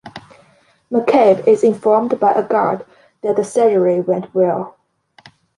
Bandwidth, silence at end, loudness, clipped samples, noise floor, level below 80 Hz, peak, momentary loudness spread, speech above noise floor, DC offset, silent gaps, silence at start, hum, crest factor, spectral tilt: 11.5 kHz; 0.9 s; -15 LUFS; under 0.1%; -54 dBFS; -64 dBFS; -2 dBFS; 12 LU; 40 dB; under 0.1%; none; 0.05 s; none; 14 dB; -6.5 dB/octave